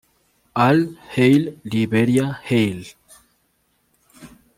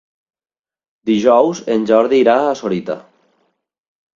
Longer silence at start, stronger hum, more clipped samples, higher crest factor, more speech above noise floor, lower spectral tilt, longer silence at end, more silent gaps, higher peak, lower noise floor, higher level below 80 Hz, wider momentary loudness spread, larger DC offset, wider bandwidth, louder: second, 0.55 s vs 1.05 s; neither; neither; about the same, 18 dB vs 16 dB; second, 48 dB vs over 76 dB; about the same, -7 dB/octave vs -6 dB/octave; second, 0.3 s vs 1.15 s; neither; second, -4 dBFS vs 0 dBFS; second, -66 dBFS vs under -90 dBFS; about the same, -58 dBFS vs -60 dBFS; second, 11 LU vs 14 LU; neither; first, 16 kHz vs 7.6 kHz; second, -19 LUFS vs -14 LUFS